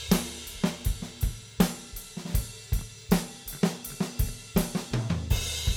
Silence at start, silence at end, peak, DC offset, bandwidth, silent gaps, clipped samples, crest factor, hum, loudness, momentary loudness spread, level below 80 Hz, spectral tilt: 0 s; 0 s; -6 dBFS; under 0.1%; 20 kHz; none; under 0.1%; 22 dB; none; -31 LUFS; 6 LU; -36 dBFS; -5 dB/octave